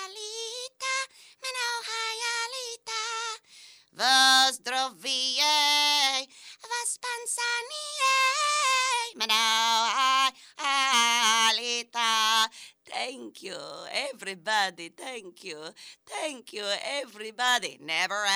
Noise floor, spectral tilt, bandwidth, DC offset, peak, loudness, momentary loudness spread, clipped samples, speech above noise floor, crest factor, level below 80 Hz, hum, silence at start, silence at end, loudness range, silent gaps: -53 dBFS; 1.5 dB/octave; over 20 kHz; under 0.1%; -12 dBFS; -25 LUFS; 18 LU; under 0.1%; 22 dB; 16 dB; -84 dBFS; none; 0 s; 0 s; 10 LU; none